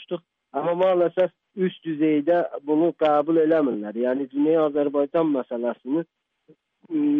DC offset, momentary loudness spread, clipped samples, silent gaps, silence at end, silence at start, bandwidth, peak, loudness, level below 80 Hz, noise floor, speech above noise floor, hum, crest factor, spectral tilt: under 0.1%; 8 LU; under 0.1%; none; 0 s; 0 s; 3.9 kHz; -10 dBFS; -23 LUFS; -72 dBFS; -59 dBFS; 38 dB; none; 12 dB; -9.5 dB/octave